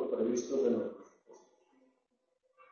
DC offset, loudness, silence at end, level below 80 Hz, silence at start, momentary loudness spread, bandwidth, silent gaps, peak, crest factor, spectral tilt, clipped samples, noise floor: under 0.1%; -34 LUFS; 1.35 s; -80 dBFS; 0 s; 12 LU; 7.2 kHz; none; -20 dBFS; 18 dB; -6.5 dB/octave; under 0.1%; -80 dBFS